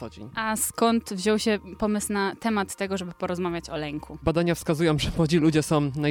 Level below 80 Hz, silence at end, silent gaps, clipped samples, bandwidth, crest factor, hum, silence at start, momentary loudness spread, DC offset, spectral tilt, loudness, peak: -46 dBFS; 0 s; none; under 0.1%; 18.5 kHz; 16 dB; none; 0 s; 9 LU; under 0.1%; -5 dB/octave; -25 LUFS; -8 dBFS